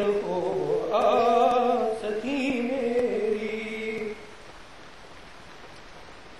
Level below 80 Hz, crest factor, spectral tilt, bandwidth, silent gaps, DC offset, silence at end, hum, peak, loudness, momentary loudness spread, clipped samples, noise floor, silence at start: -58 dBFS; 18 dB; -5.5 dB/octave; 12.5 kHz; none; 0.4%; 0 s; none; -10 dBFS; -26 LUFS; 25 LU; under 0.1%; -47 dBFS; 0 s